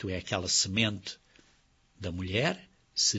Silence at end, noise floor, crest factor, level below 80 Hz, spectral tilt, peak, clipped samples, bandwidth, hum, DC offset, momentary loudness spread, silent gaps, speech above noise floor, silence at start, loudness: 0 s; -66 dBFS; 22 dB; -58 dBFS; -2.5 dB/octave; -12 dBFS; under 0.1%; 8.2 kHz; none; under 0.1%; 16 LU; none; 35 dB; 0 s; -30 LUFS